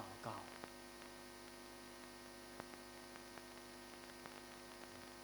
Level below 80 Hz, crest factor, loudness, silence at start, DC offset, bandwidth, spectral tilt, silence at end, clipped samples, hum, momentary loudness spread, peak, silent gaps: -74 dBFS; 26 dB; -54 LUFS; 0 s; under 0.1%; over 20 kHz; -3 dB/octave; 0 s; under 0.1%; none; 4 LU; -28 dBFS; none